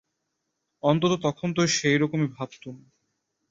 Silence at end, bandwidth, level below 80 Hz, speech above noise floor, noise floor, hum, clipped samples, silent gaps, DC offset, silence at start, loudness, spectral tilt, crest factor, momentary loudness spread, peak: 0.75 s; 7.8 kHz; -64 dBFS; 55 dB; -79 dBFS; none; under 0.1%; none; under 0.1%; 0.85 s; -24 LUFS; -5 dB/octave; 20 dB; 15 LU; -8 dBFS